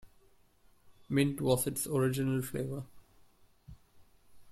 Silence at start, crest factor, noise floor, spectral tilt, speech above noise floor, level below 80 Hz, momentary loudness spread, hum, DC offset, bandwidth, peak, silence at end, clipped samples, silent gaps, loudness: 0.05 s; 20 dB; -64 dBFS; -5.5 dB/octave; 33 dB; -62 dBFS; 10 LU; none; under 0.1%; 16 kHz; -16 dBFS; 0 s; under 0.1%; none; -32 LUFS